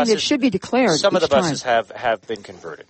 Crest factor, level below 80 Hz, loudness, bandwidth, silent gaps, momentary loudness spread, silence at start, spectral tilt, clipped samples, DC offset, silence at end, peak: 16 dB; -56 dBFS; -19 LUFS; 8.8 kHz; none; 13 LU; 0 s; -4 dB/octave; under 0.1%; under 0.1%; 0.1 s; -4 dBFS